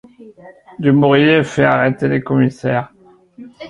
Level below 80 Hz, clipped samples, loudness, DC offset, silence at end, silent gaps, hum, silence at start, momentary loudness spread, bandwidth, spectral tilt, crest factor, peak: -52 dBFS; under 0.1%; -14 LUFS; under 0.1%; 0 s; none; none; 0.2 s; 9 LU; 9.6 kHz; -7.5 dB/octave; 14 dB; 0 dBFS